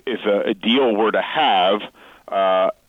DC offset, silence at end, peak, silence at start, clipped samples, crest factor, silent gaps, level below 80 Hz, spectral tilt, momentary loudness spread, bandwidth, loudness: under 0.1%; 0.15 s; -6 dBFS; 0.05 s; under 0.1%; 12 dB; none; -64 dBFS; -6 dB/octave; 7 LU; 7 kHz; -18 LUFS